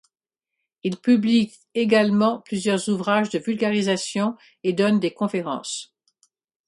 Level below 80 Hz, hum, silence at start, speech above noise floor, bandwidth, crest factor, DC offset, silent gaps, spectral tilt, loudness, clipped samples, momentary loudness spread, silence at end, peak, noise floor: -68 dBFS; none; 0.85 s; 65 dB; 11.5 kHz; 16 dB; under 0.1%; none; -5 dB/octave; -22 LUFS; under 0.1%; 10 LU; 0.85 s; -6 dBFS; -87 dBFS